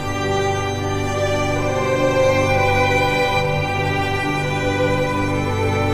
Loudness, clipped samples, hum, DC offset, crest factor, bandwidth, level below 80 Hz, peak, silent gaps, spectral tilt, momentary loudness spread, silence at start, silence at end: -19 LUFS; under 0.1%; 50 Hz at -45 dBFS; 0.3%; 14 dB; 15.5 kHz; -34 dBFS; -6 dBFS; none; -5.5 dB/octave; 5 LU; 0 s; 0 s